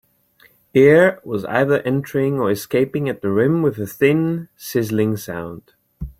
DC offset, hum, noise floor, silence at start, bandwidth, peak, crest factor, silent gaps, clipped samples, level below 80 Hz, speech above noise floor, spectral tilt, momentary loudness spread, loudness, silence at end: under 0.1%; none; -55 dBFS; 0.75 s; 16.5 kHz; -2 dBFS; 16 dB; none; under 0.1%; -48 dBFS; 37 dB; -7 dB/octave; 13 LU; -18 LUFS; 0.1 s